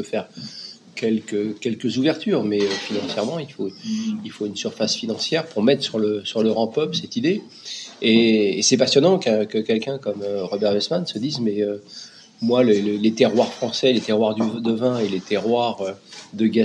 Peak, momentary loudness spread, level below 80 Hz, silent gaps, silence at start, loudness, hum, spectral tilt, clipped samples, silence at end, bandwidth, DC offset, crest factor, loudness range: -2 dBFS; 13 LU; -76 dBFS; none; 0 s; -21 LUFS; none; -4.5 dB/octave; under 0.1%; 0 s; 10 kHz; under 0.1%; 18 dB; 5 LU